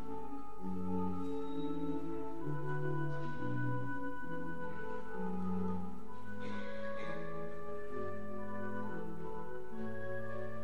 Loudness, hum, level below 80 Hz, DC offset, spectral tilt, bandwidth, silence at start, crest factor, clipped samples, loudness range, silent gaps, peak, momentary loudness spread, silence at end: -42 LUFS; none; -62 dBFS; 2%; -8.5 dB/octave; 15 kHz; 0 s; 14 dB; under 0.1%; 4 LU; none; -24 dBFS; 7 LU; 0 s